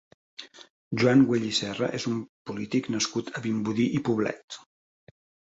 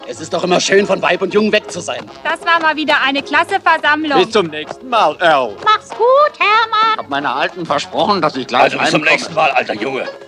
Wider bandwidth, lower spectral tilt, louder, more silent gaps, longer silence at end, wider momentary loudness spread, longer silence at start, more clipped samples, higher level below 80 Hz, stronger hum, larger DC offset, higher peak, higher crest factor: second, 8 kHz vs 12 kHz; first, -5 dB/octave vs -3.5 dB/octave; second, -26 LUFS vs -14 LUFS; first, 0.70-0.91 s, 2.29-2.45 s, 4.44-4.48 s vs none; first, 0.9 s vs 0 s; first, 22 LU vs 8 LU; first, 0.4 s vs 0 s; neither; about the same, -64 dBFS vs -60 dBFS; neither; neither; second, -8 dBFS vs 0 dBFS; first, 20 dB vs 14 dB